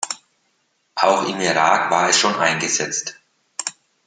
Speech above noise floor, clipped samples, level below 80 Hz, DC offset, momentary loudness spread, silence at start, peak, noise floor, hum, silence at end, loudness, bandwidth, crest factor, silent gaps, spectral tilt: 49 dB; under 0.1%; -70 dBFS; under 0.1%; 16 LU; 0 s; 0 dBFS; -67 dBFS; none; 0.35 s; -18 LUFS; 10.5 kHz; 20 dB; none; -1.5 dB/octave